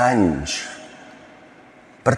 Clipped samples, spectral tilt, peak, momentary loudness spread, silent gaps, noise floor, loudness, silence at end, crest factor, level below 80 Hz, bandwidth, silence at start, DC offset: under 0.1%; -5 dB/octave; -2 dBFS; 26 LU; none; -47 dBFS; -22 LUFS; 0 s; 22 dB; -46 dBFS; 12 kHz; 0 s; under 0.1%